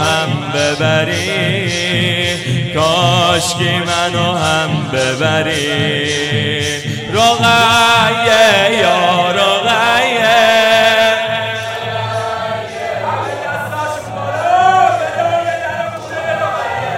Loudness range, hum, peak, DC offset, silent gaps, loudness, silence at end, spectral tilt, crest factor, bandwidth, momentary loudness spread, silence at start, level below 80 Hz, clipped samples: 6 LU; none; 0 dBFS; under 0.1%; none; -13 LUFS; 0 s; -3.5 dB/octave; 14 dB; 16.5 kHz; 11 LU; 0 s; -50 dBFS; under 0.1%